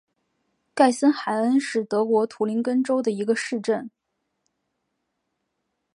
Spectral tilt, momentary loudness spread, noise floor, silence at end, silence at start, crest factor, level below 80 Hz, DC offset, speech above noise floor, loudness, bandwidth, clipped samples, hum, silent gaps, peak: -5 dB/octave; 7 LU; -77 dBFS; 2.1 s; 0.75 s; 20 dB; -80 dBFS; under 0.1%; 55 dB; -23 LUFS; 11.5 kHz; under 0.1%; none; none; -4 dBFS